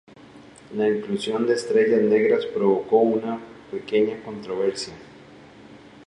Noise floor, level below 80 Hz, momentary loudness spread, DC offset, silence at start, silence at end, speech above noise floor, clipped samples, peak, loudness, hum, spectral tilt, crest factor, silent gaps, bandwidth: -47 dBFS; -64 dBFS; 16 LU; under 0.1%; 0.35 s; 0.05 s; 25 dB; under 0.1%; -6 dBFS; -22 LUFS; none; -5.5 dB/octave; 18 dB; none; 11 kHz